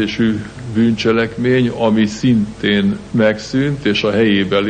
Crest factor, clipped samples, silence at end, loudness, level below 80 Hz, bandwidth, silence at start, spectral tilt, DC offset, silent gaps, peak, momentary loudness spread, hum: 14 dB; under 0.1%; 0 s; -15 LUFS; -44 dBFS; 9.2 kHz; 0 s; -6.5 dB/octave; under 0.1%; none; -2 dBFS; 4 LU; none